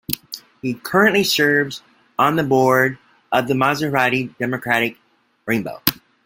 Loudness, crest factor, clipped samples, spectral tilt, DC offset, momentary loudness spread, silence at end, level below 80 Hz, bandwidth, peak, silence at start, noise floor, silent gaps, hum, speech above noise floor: -18 LUFS; 20 dB; under 0.1%; -4.5 dB/octave; under 0.1%; 12 LU; 0.3 s; -56 dBFS; 17 kHz; 0 dBFS; 0.1 s; -38 dBFS; none; none; 20 dB